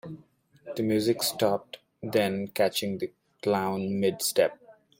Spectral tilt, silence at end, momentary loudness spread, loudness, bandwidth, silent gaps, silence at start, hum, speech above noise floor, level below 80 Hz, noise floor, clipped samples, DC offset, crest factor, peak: -4.5 dB/octave; 0.3 s; 14 LU; -28 LUFS; 16.5 kHz; none; 0.05 s; none; 32 dB; -68 dBFS; -59 dBFS; under 0.1%; under 0.1%; 18 dB; -10 dBFS